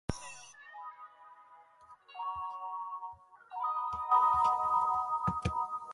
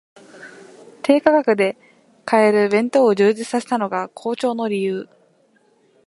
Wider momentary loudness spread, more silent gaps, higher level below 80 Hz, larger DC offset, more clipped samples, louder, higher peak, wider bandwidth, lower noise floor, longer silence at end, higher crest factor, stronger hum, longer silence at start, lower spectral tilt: first, 21 LU vs 11 LU; neither; first, -56 dBFS vs -70 dBFS; neither; neither; second, -32 LUFS vs -18 LUFS; second, -16 dBFS vs 0 dBFS; about the same, 11.5 kHz vs 11.5 kHz; about the same, -59 dBFS vs -58 dBFS; second, 0 s vs 1 s; about the same, 20 dB vs 20 dB; neither; second, 0.1 s vs 0.35 s; about the same, -5.5 dB/octave vs -5.5 dB/octave